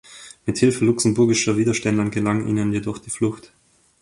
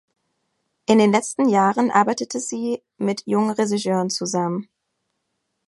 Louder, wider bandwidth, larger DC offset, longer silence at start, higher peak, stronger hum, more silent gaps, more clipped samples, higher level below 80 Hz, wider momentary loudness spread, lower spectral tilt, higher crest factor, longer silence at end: about the same, -20 LUFS vs -20 LUFS; about the same, 11.5 kHz vs 11.5 kHz; neither; second, 0.1 s vs 0.9 s; about the same, -4 dBFS vs -2 dBFS; neither; neither; neither; first, -52 dBFS vs -68 dBFS; about the same, 10 LU vs 9 LU; about the same, -5 dB/octave vs -5 dB/octave; about the same, 16 dB vs 20 dB; second, 0.6 s vs 1.05 s